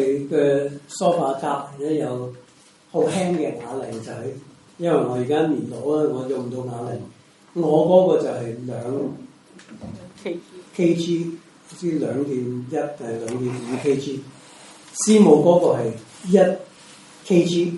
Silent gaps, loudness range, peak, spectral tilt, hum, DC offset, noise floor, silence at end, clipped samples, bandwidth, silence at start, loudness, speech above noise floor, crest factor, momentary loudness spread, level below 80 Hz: none; 8 LU; -2 dBFS; -6 dB/octave; none; under 0.1%; -52 dBFS; 0 s; under 0.1%; 11.5 kHz; 0 s; -21 LUFS; 31 dB; 20 dB; 18 LU; -66 dBFS